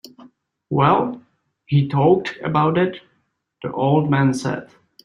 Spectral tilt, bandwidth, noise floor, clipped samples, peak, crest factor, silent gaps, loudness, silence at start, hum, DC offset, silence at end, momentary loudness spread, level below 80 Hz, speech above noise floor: -7.5 dB/octave; 11 kHz; -68 dBFS; under 0.1%; -2 dBFS; 18 dB; none; -19 LUFS; 0.2 s; none; under 0.1%; 0.4 s; 13 LU; -58 dBFS; 50 dB